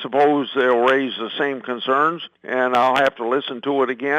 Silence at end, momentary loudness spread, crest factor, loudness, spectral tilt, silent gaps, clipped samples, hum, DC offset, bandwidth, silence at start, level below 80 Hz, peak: 0 s; 7 LU; 12 dB; -19 LUFS; -5 dB/octave; none; under 0.1%; none; under 0.1%; 10 kHz; 0 s; -70 dBFS; -6 dBFS